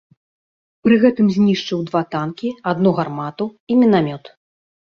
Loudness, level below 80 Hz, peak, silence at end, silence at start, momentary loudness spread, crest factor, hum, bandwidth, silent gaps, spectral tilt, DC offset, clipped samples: -18 LUFS; -58 dBFS; -2 dBFS; 0.7 s; 0.85 s; 11 LU; 16 dB; none; 6.8 kHz; 3.60-3.67 s; -7.5 dB/octave; under 0.1%; under 0.1%